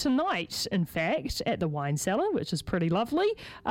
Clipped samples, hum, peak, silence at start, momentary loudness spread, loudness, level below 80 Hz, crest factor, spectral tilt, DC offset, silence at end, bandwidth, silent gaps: under 0.1%; none; -14 dBFS; 0 s; 4 LU; -29 LUFS; -50 dBFS; 16 dB; -5 dB/octave; under 0.1%; 0 s; 17 kHz; none